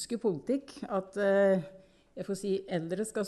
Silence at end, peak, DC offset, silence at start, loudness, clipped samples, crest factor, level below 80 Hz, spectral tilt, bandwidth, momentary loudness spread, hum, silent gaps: 0 s; -16 dBFS; under 0.1%; 0 s; -31 LUFS; under 0.1%; 14 dB; -68 dBFS; -5.5 dB/octave; 12 kHz; 14 LU; none; none